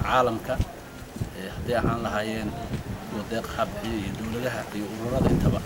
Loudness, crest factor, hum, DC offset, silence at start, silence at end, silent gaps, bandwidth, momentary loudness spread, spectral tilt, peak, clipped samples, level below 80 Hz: -28 LUFS; 20 dB; none; under 0.1%; 0 s; 0 s; none; 18.5 kHz; 11 LU; -6 dB/octave; -8 dBFS; under 0.1%; -38 dBFS